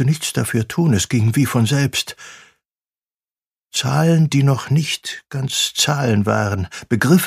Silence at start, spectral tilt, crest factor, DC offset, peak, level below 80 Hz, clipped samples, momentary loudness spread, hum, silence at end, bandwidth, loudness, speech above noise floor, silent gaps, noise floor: 0 s; -5 dB/octave; 16 dB; under 0.1%; -2 dBFS; -50 dBFS; under 0.1%; 9 LU; none; 0 s; 15.5 kHz; -18 LUFS; over 73 dB; 3.46-3.51 s; under -90 dBFS